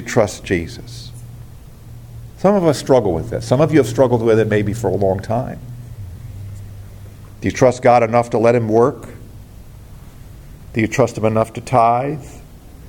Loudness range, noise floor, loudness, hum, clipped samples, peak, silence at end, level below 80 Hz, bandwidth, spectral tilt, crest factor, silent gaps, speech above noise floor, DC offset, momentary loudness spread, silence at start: 4 LU; -37 dBFS; -16 LUFS; none; under 0.1%; 0 dBFS; 0 s; -42 dBFS; 17 kHz; -6.5 dB/octave; 18 dB; none; 22 dB; under 0.1%; 23 LU; 0 s